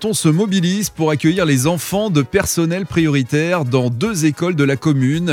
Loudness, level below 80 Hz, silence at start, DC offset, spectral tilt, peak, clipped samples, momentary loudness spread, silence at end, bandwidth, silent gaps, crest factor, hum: -16 LUFS; -44 dBFS; 0 s; under 0.1%; -5.5 dB/octave; 0 dBFS; under 0.1%; 3 LU; 0 s; 17 kHz; none; 16 dB; none